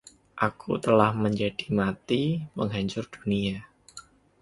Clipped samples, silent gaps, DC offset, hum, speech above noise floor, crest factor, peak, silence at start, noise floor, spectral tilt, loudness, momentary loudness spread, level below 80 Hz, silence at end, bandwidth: under 0.1%; none; under 0.1%; none; 24 dB; 24 dB; -4 dBFS; 0.35 s; -50 dBFS; -6.5 dB/octave; -27 LUFS; 24 LU; -56 dBFS; 0.4 s; 11.5 kHz